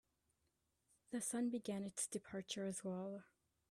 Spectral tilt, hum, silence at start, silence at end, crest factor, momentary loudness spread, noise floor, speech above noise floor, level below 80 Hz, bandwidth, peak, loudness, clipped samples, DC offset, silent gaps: -4 dB/octave; none; 1.1 s; 0.45 s; 18 dB; 8 LU; -85 dBFS; 40 dB; -84 dBFS; 15 kHz; -30 dBFS; -45 LUFS; under 0.1%; under 0.1%; none